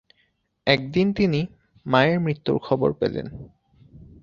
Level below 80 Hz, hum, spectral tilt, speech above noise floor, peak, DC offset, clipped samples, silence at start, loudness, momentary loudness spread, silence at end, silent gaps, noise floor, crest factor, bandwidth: -52 dBFS; none; -7.5 dB/octave; 46 dB; -2 dBFS; under 0.1%; under 0.1%; 0.65 s; -23 LUFS; 14 LU; 0.2 s; none; -68 dBFS; 22 dB; 7 kHz